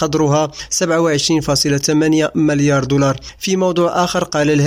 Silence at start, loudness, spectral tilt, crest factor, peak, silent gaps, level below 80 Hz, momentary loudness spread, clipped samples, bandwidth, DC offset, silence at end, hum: 0 s; -15 LUFS; -4.5 dB/octave; 12 dB; -2 dBFS; none; -42 dBFS; 4 LU; under 0.1%; 16 kHz; under 0.1%; 0 s; none